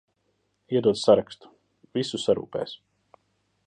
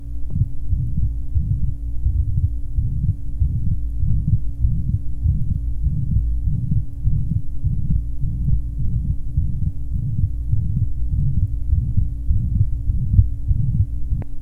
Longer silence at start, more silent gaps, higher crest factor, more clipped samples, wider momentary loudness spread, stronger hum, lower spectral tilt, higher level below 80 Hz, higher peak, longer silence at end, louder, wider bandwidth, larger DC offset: first, 0.7 s vs 0 s; neither; about the same, 22 dB vs 18 dB; neither; first, 22 LU vs 4 LU; neither; second, -5.5 dB/octave vs -11.5 dB/octave; second, -64 dBFS vs -22 dBFS; second, -6 dBFS vs 0 dBFS; first, 0.9 s vs 0 s; about the same, -25 LUFS vs -23 LUFS; first, 10 kHz vs 0.9 kHz; neither